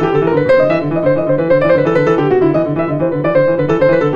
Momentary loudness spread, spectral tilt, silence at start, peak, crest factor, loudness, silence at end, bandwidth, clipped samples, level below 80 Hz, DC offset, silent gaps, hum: 4 LU; -9 dB/octave; 0 s; 0 dBFS; 12 dB; -13 LUFS; 0 s; 7 kHz; under 0.1%; -44 dBFS; under 0.1%; none; none